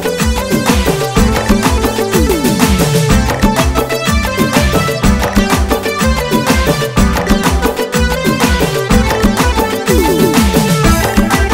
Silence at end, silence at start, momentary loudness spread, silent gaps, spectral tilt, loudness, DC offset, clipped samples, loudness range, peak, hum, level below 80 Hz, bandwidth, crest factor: 0 s; 0 s; 3 LU; none; -5 dB/octave; -12 LUFS; under 0.1%; under 0.1%; 1 LU; 0 dBFS; none; -18 dBFS; 16.5 kHz; 12 dB